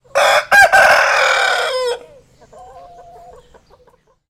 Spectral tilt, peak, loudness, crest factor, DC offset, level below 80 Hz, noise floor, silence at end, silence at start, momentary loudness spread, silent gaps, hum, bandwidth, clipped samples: 0 dB/octave; 0 dBFS; -11 LUFS; 16 dB; under 0.1%; -50 dBFS; -53 dBFS; 1.5 s; 0.15 s; 13 LU; none; none; 16.5 kHz; under 0.1%